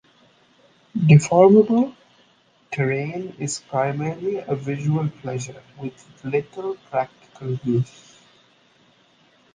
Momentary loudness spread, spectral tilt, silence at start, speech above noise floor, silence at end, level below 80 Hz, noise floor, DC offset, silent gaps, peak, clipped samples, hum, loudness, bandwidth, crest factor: 20 LU; -7 dB/octave; 0.95 s; 38 dB; 1.7 s; -62 dBFS; -59 dBFS; under 0.1%; none; -2 dBFS; under 0.1%; none; -21 LUFS; 9.8 kHz; 20 dB